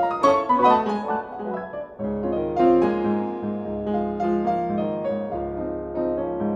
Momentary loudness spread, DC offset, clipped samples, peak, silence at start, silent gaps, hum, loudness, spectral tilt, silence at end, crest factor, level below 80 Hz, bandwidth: 11 LU; under 0.1%; under 0.1%; -6 dBFS; 0 s; none; none; -23 LUFS; -7.5 dB/octave; 0 s; 18 dB; -48 dBFS; 8.6 kHz